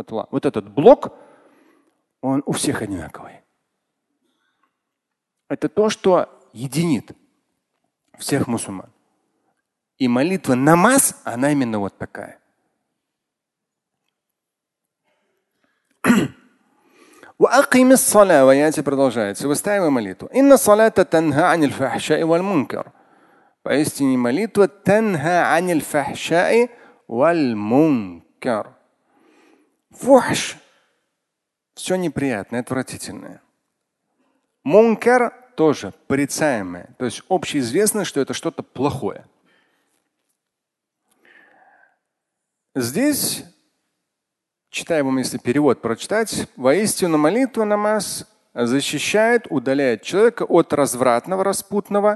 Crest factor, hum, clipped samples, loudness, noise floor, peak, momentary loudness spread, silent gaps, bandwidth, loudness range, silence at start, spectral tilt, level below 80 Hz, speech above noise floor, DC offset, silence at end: 20 dB; none; under 0.1%; -18 LUFS; -83 dBFS; 0 dBFS; 15 LU; none; 12.5 kHz; 11 LU; 0 s; -4.5 dB/octave; -58 dBFS; 65 dB; under 0.1%; 0 s